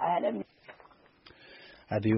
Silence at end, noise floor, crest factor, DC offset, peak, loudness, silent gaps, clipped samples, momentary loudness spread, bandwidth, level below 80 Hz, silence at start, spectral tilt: 0 s; -59 dBFS; 18 dB; under 0.1%; -14 dBFS; -33 LUFS; none; under 0.1%; 24 LU; 5.8 kHz; -66 dBFS; 0 s; -6.5 dB/octave